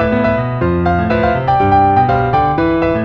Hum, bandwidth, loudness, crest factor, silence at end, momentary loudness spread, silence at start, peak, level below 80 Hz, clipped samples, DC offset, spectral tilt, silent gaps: none; 6.2 kHz; -13 LUFS; 12 dB; 0 s; 5 LU; 0 s; 0 dBFS; -30 dBFS; under 0.1%; under 0.1%; -9.5 dB/octave; none